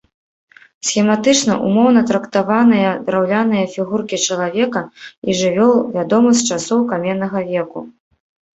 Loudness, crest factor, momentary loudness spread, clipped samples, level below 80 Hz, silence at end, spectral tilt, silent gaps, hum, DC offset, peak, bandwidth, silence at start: -16 LUFS; 14 dB; 9 LU; under 0.1%; -58 dBFS; 0.65 s; -4.5 dB/octave; 5.17-5.22 s; none; under 0.1%; -2 dBFS; 8.2 kHz; 0.85 s